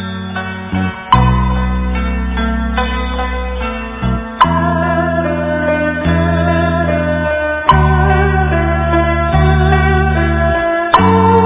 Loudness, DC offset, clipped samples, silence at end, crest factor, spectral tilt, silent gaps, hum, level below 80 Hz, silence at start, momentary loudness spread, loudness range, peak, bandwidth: -14 LUFS; under 0.1%; 0.2%; 0 s; 12 dB; -11 dB/octave; none; none; -20 dBFS; 0 s; 8 LU; 4 LU; 0 dBFS; 4 kHz